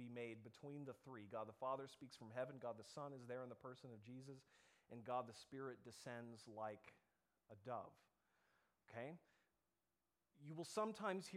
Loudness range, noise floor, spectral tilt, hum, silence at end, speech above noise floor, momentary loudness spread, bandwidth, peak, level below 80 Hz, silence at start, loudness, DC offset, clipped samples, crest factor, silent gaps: 6 LU; under -90 dBFS; -5.5 dB/octave; none; 0 s; over 37 dB; 13 LU; 14.5 kHz; -32 dBFS; under -90 dBFS; 0 s; -53 LUFS; under 0.1%; under 0.1%; 22 dB; none